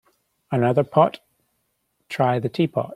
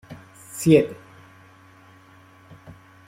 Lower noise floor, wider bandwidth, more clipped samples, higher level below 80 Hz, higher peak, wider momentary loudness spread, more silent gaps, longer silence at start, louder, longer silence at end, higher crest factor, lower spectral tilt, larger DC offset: first, -72 dBFS vs -51 dBFS; second, 13.5 kHz vs 16.5 kHz; neither; about the same, -64 dBFS vs -60 dBFS; about the same, -2 dBFS vs -2 dBFS; second, 10 LU vs 26 LU; neither; first, 0.5 s vs 0.1 s; about the same, -21 LUFS vs -20 LUFS; second, 0 s vs 2.15 s; about the same, 22 dB vs 22 dB; first, -8 dB/octave vs -6.5 dB/octave; neither